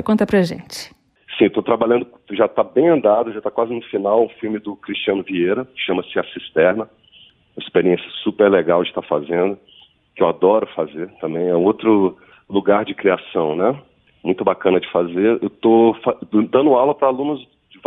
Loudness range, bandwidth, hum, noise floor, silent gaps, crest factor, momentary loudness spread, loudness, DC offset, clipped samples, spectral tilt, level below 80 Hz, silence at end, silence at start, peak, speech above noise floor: 4 LU; 12.5 kHz; none; -50 dBFS; none; 18 dB; 11 LU; -18 LUFS; under 0.1%; under 0.1%; -7 dB/octave; -58 dBFS; 0.45 s; 0 s; 0 dBFS; 33 dB